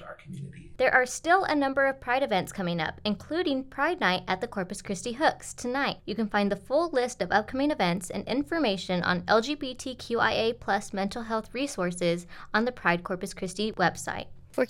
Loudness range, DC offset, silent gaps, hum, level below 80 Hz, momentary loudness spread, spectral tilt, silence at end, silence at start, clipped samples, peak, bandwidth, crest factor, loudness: 3 LU; under 0.1%; none; none; -56 dBFS; 10 LU; -4.5 dB/octave; 0 s; 0 s; under 0.1%; -8 dBFS; 16 kHz; 20 dB; -28 LUFS